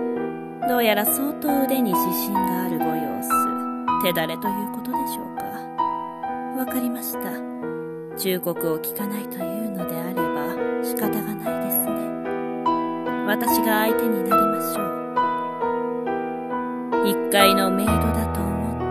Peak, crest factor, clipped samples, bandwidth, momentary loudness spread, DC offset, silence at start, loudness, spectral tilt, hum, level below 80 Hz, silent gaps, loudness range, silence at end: -2 dBFS; 22 dB; under 0.1%; 14.5 kHz; 9 LU; under 0.1%; 0 s; -23 LUFS; -4.5 dB/octave; none; -46 dBFS; none; 6 LU; 0 s